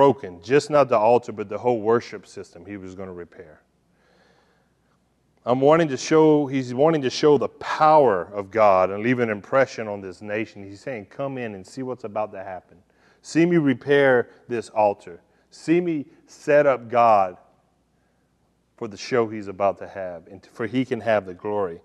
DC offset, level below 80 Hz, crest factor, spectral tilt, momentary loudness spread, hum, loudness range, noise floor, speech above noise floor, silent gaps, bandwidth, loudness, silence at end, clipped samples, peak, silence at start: under 0.1%; -66 dBFS; 18 dB; -6 dB/octave; 19 LU; none; 10 LU; -66 dBFS; 44 dB; none; 10.5 kHz; -21 LUFS; 0.1 s; under 0.1%; -4 dBFS; 0 s